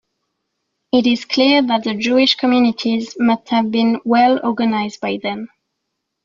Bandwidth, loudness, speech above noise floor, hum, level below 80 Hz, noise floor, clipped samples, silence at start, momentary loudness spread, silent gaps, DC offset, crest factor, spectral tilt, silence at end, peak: 7.4 kHz; -16 LUFS; 60 dB; none; -60 dBFS; -76 dBFS; under 0.1%; 0.95 s; 9 LU; none; under 0.1%; 16 dB; -5 dB/octave; 0.8 s; -2 dBFS